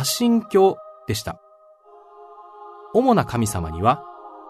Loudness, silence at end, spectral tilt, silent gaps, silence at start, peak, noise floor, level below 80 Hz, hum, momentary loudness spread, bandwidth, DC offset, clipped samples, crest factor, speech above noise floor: -20 LUFS; 0 s; -5 dB/octave; none; 0 s; -4 dBFS; -51 dBFS; -46 dBFS; none; 23 LU; 13.5 kHz; under 0.1%; under 0.1%; 18 dB; 31 dB